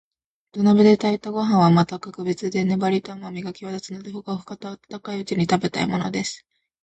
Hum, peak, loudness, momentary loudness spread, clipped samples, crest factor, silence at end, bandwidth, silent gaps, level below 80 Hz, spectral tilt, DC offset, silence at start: none; -4 dBFS; -21 LUFS; 18 LU; under 0.1%; 18 dB; 0.45 s; 8.8 kHz; none; -60 dBFS; -6.5 dB/octave; under 0.1%; 0.55 s